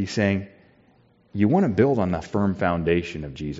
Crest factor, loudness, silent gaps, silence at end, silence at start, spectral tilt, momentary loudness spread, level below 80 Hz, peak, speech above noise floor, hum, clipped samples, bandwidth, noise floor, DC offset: 18 dB; -23 LUFS; none; 0 s; 0 s; -6.5 dB/octave; 13 LU; -50 dBFS; -4 dBFS; 36 dB; none; under 0.1%; 7.6 kHz; -59 dBFS; under 0.1%